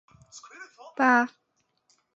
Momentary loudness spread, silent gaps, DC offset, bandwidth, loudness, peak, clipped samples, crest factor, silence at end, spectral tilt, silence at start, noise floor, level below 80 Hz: 25 LU; none; under 0.1%; 8 kHz; -23 LUFS; -8 dBFS; under 0.1%; 20 dB; 0.9 s; -3.5 dB/octave; 0.35 s; -71 dBFS; -76 dBFS